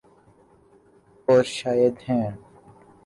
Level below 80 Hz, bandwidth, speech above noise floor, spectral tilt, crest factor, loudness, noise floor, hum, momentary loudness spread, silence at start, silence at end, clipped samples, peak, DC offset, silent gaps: -62 dBFS; 11.5 kHz; 35 dB; -6 dB/octave; 18 dB; -23 LUFS; -56 dBFS; none; 12 LU; 1.3 s; 0.7 s; under 0.1%; -8 dBFS; under 0.1%; none